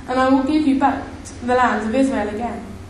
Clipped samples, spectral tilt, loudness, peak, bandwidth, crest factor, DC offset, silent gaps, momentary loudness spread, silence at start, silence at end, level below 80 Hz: under 0.1%; -5.5 dB/octave; -19 LUFS; -4 dBFS; 11 kHz; 14 dB; under 0.1%; none; 11 LU; 0 s; 0 s; -42 dBFS